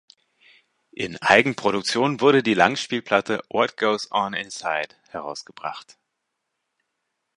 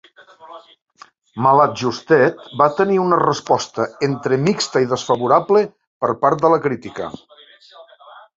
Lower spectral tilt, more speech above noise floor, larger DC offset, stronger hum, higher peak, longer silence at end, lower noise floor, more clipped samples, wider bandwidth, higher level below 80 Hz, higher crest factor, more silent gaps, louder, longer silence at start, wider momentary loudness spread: second, -4 dB/octave vs -5.5 dB/octave; first, 57 dB vs 28 dB; neither; neither; about the same, 0 dBFS vs -2 dBFS; first, 1.55 s vs 0.15 s; first, -79 dBFS vs -45 dBFS; neither; first, 11 kHz vs 7.8 kHz; about the same, -64 dBFS vs -60 dBFS; first, 24 dB vs 16 dB; second, none vs 0.82-0.86 s, 5.87-6.01 s; second, -21 LUFS vs -17 LUFS; first, 1 s vs 0.45 s; first, 16 LU vs 10 LU